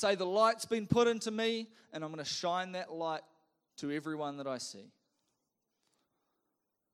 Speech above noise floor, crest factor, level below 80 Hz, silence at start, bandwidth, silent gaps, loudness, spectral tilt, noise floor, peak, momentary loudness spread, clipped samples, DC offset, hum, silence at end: 50 dB; 22 dB; -72 dBFS; 0 s; 14 kHz; none; -35 LUFS; -4.5 dB/octave; -85 dBFS; -14 dBFS; 14 LU; under 0.1%; under 0.1%; none; 2.05 s